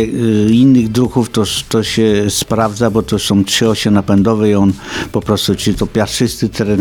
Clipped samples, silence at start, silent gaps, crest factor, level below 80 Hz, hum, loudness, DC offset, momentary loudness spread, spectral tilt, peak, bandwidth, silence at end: under 0.1%; 0 s; none; 12 dB; -36 dBFS; none; -13 LUFS; under 0.1%; 6 LU; -5 dB/octave; 0 dBFS; 18.5 kHz; 0 s